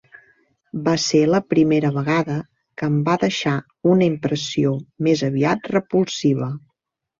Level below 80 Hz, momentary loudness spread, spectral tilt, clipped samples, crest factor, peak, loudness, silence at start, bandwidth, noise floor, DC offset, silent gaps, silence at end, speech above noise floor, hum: -58 dBFS; 9 LU; -6 dB/octave; under 0.1%; 16 dB; -4 dBFS; -20 LUFS; 0.75 s; 7.6 kHz; -77 dBFS; under 0.1%; none; 0.6 s; 58 dB; none